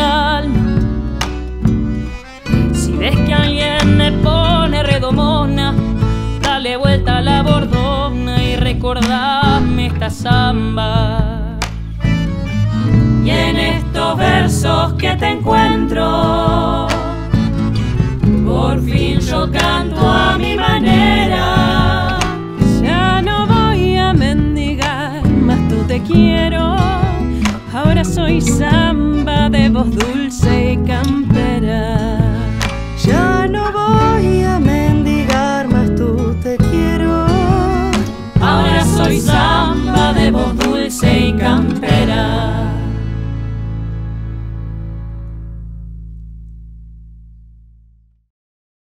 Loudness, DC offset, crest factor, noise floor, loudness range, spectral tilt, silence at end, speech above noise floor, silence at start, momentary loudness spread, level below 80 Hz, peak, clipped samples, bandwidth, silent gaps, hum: -14 LUFS; under 0.1%; 14 dB; -49 dBFS; 3 LU; -6 dB/octave; 1.7 s; 36 dB; 0 s; 8 LU; -22 dBFS; 0 dBFS; under 0.1%; 15.5 kHz; none; none